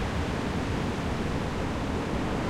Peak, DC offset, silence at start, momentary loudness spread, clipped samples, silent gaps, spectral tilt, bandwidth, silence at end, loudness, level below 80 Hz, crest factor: -16 dBFS; under 0.1%; 0 s; 1 LU; under 0.1%; none; -6 dB/octave; 15.5 kHz; 0 s; -30 LUFS; -38 dBFS; 12 dB